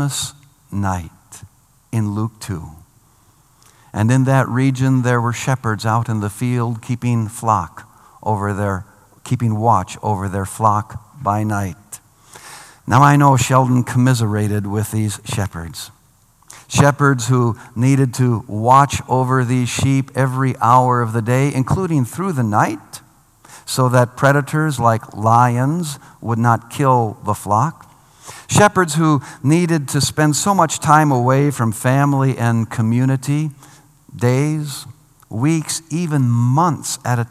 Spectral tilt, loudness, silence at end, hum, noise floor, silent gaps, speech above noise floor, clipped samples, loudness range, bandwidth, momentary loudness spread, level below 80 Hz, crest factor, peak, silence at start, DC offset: -6 dB/octave; -17 LUFS; 0.05 s; none; -54 dBFS; none; 37 dB; under 0.1%; 5 LU; 15 kHz; 14 LU; -52 dBFS; 16 dB; 0 dBFS; 0 s; under 0.1%